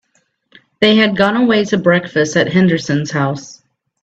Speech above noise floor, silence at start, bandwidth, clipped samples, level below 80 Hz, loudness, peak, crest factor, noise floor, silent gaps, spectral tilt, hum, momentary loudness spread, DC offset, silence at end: 49 dB; 0.8 s; 8 kHz; under 0.1%; -54 dBFS; -14 LUFS; 0 dBFS; 14 dB; -62 dBFS; none; -5.5 dB/octave; none; 7 LU; under 0.1%; 0.5 s